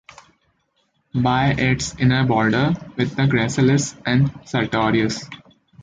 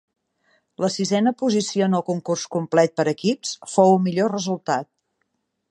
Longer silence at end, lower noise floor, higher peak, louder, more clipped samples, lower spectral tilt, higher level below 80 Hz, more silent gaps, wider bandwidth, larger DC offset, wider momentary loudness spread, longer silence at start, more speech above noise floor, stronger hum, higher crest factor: second, 0.45 s vs 0.85 s; second, -67 dBFS vs -74 dBFS; about the same, -4 dBFS vs -2 dBFS; about the same, -19 LUFS vs -21 LUFS; neither; about the same, -5.5 dB/octave vs -5.5 dB/octave; first, -46 dBFS vs -70 dBFS; neither; second, 9.4 kHz vs 11 kHz; neither; about the same, 7 LU vs 9 LU; first, 1.15 s vs 0.8 s; second, 48 dB vs 53 dB; neither; about the same, 16 dB vs 20 dB